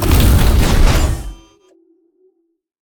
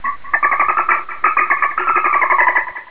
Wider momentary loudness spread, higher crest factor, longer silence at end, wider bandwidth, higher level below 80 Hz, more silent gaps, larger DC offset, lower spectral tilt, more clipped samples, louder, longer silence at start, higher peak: first, 14 LU vs 5 LU; about the same, 14 dB vs 14 dB; first, 1.6 s vs 0 s; first, over 20 kHz vs 4 kHz; first, -16 dBFS vs -54 dBFS; neither; second, under 0.1% vs 3%; about the same, -5 dB/octave vs -5.5 dB/octave; neither; about the same, -14 LUFS vs -14 LUFS; about the same, 0 s vs 0.05 s; about the same, 0 dBFS vs -2 dBFS